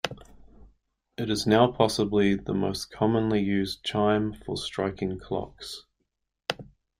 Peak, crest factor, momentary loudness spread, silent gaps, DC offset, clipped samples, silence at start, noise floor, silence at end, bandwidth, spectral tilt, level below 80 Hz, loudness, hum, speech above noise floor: -4 dBFS; 24 dB; 16 LU; none; under 0.1%; under 0.1%; 0.05 s; -79 dBFS; 0.35 s; 15.5 kHz; -5.5 dB/octave; -54 dBFS; -27 LUFS; none; 53 dB